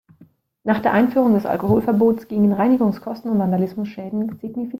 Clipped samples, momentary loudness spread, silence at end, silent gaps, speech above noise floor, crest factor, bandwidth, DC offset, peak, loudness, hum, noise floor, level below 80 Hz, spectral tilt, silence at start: under 0.1%; 11 LU; 0 s; none; 34 dB; 14 dB; 15.5 kHz; under 0.1%; -4 dBFS; -19 LUFS; none; -53 dBFS; -54 dBFS; -9.5 dB/octave; 0.65 s